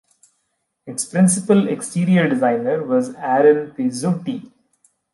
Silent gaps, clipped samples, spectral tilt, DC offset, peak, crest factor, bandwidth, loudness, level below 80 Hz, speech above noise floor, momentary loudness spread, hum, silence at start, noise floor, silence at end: none; under 0.1%; -6 dB/octave; under 0.1%; -4 dBFS; 16 dB; 11.5 kHz; -18 LUFS; -66 dBFS; 54 dB; 11 LU; none; 0.85 s; -72 dBFS; 0.7 s